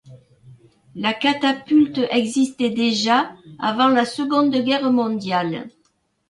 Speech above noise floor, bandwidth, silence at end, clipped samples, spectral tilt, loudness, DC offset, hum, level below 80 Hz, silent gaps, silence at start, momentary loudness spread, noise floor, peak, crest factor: 47 dB; 11.5 kHz; 0.6 s; under 0.1%; -4.5 dB/octave; -19 LUFS; under 0.1%; none; -64 dBFS; none; 0.05 s; 9 LU; -66 dBFS; -4 dBFS; 16 dB